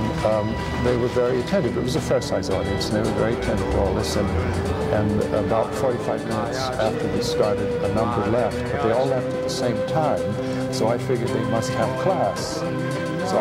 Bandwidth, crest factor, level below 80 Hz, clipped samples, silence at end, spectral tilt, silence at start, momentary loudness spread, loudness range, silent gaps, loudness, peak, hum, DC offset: 16 kHz; 16 dB; -40 dBFS; under 0.1%; 0 s; -6 dB/octave; 0 s; 4 LU; 1 LU; none; -23 LUFS; -6 dBFS; none; under 0.1%